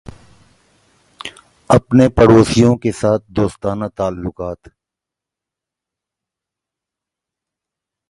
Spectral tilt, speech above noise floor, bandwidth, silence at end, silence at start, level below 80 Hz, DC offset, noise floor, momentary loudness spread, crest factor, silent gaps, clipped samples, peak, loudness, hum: -7 dB/octave; 71 dB; 11.5 kHz; 3.55 s; 1.25 s; -38 dBFS; under 0.1%; -85 dBFS; 22 LU; 18 dB; none; under 0.1%; 0 dBFS; -14 LUFS; none